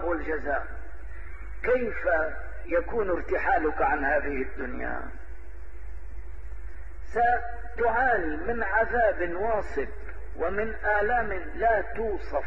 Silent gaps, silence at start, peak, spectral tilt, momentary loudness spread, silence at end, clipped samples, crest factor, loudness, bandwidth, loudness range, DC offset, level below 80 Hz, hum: none; 0 s; -12 dBFS; -8 dB/octave; 20 LU; 0 s; under 0.1%; 18 dB; -27 LUFS; 7.8 kHz; 6 LU; 3%; -40 dBFS; none